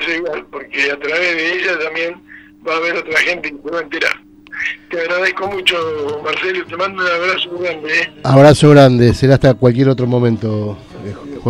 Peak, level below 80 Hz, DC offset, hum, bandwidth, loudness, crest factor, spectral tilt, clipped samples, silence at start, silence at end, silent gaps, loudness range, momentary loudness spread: 0 dBFS; -42 dBFS; under 0.1%; none; 12 kHz; -14 LUFS; 14 dB; -6 dB/octave; 0.3%; 0 s; 0 s; none; 7 LU; 15 LU